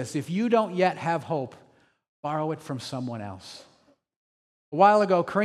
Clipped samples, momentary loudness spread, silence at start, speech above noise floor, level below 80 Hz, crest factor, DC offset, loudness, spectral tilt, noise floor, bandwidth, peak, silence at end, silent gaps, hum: under 0.1%; 20 LU; 0 s; 38 dB; -76 dBFS; 20 dB; under 0.1%; -25 LUFS; -6 dB/octave; -63 dBFS; 13 kHz; -6 dBFS; 0 s; 2.08-2.23 s, 4.16-4.72 s; none